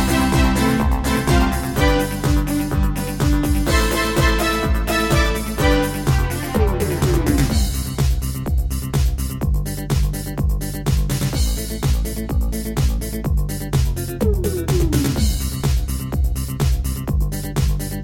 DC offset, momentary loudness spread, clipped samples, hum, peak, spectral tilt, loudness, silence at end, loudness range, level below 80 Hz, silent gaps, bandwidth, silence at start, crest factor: under 0.1%; 6 LU; under 0.1%; none; -2 dBFS; -5.5 dB/octave; -20 LUFS; 0 s; 4 LU; -22 dBFS; none; 17 kHz; 0 s; 16 dB